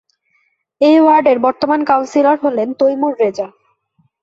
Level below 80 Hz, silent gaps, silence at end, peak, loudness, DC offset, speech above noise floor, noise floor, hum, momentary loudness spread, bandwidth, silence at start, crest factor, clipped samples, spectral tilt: -62 dBFS; none; 0.75 s; -2 dBFS; -13 LUFS; under 0.1%; 50 dB; -62 dBFS; none; 8 LU; 7.8 kHz; 0.8 s; 14 dB; under 0.1%; -5.5 dB/octave